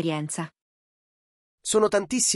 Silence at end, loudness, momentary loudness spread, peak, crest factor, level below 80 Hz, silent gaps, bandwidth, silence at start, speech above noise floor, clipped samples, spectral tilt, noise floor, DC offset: 0 s; -25 LUFS; 13 LU; -8 dBFS; 18 dB; -64 dBFS; 0.61-1.58 s; 14 kHz; 0 s; over 66 dB; under 0.1%; -3 dB/octave; under -90 dBFS; under 0.1%